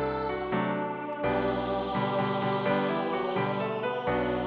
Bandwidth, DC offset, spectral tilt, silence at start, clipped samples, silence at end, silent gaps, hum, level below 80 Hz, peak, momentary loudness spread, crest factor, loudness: 5.4 kHz; under 0.1%; -9 dB/octave; 0 s; under 0.1%; 0 s; none; none; -52 dBFS; -16 dBFS; 3 LU; 14 dB; -29 LUFS